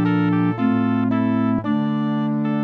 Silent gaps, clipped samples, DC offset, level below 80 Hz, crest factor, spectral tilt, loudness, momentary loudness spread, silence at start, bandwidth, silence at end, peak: none; under 0.1%; under 0.1%; -56 dBFS; 10 dB; -10 dB/octave; -20 LUFS; 3 LU; 0 s; 4.7 kHz; 0 s; -8 dBFS